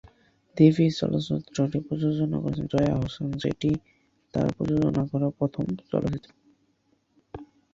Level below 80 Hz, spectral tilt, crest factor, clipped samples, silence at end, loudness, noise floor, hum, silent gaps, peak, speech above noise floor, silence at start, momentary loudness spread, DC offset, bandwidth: -50 dBFS; -8 dB/octave; 22 dB; under 0.1%; 0.3 s; -26 LUFS; -69 dBFS; none; none; -6 dBFS; 44 dB; 0.55 s; 13 LU; under 0.1%; 7.6 kHz